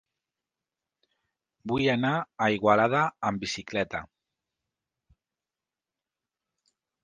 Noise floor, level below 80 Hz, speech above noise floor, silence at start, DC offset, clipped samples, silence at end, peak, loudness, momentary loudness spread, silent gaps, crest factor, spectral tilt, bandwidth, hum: under -90 dBFS; -62 dBFS; over 64 dB; 1.65 s; under 0.1%; under 0.1%; 3 s; -8 dBFS; -26 LUFS; 11 LU; none; 24 dB; -5.5 dB/octave; 10 kHz; none